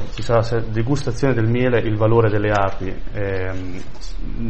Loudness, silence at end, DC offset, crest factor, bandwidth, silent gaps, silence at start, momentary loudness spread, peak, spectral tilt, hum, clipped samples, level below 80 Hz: -20 LUFS; 0 s; 7%; 16 dB; 8.6 kHz; none; 0 s; 16 LU; -2 dBFS; -7.5 dB/octave; none; under 0.1%; -32 dBFS